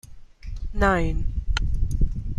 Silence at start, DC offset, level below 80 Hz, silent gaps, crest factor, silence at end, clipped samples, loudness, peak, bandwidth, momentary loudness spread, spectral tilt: 0.05 s; under 0.1%; -26 dBFS; none; 18 dB; 0 s; under 0.1%; -26 LUFS; -6 dBFS; 11.5 kHz; 17 LU; -6.5 dB/octave